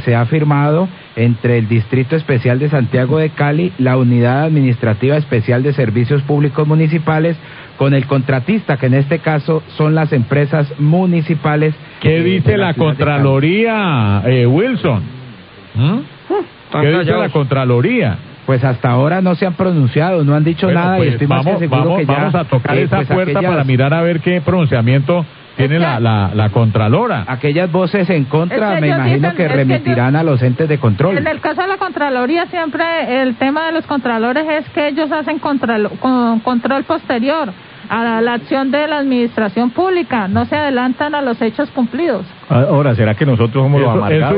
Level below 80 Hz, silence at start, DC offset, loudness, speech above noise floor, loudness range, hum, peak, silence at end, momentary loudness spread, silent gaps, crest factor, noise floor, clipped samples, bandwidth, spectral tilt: -42 dBFS; 0 s; under 0.1%; -14 LUFS; 22 dB; 2 LU; none; 0 dBFS; 0 s; 5 LU; none; 14 dB; -35 dBFS; under 0.1%; 5.2 kHz; -13 dB/octave